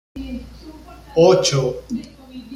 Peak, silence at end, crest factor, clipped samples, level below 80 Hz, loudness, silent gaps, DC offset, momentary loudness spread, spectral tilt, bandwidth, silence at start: -2 dBFS; 0 s; 18 dB; under 0.1%; -42 dBFS; -17 LUFS; none; under 0.1%; 25 LU; -5 dB/octave; 14 kHz; 0.15 s